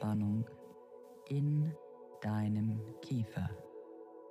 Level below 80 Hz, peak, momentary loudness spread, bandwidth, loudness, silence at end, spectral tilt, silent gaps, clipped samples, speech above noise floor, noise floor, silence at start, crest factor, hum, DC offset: -72 dBFS; -24 dBFS; 20 LU; 12 kHz; -38 LUFS; 0 s; -9 dB/octave; none; under 0.1%; 20 dB; -55 dBFS; 0 s; 12 dB; none; under 0.1%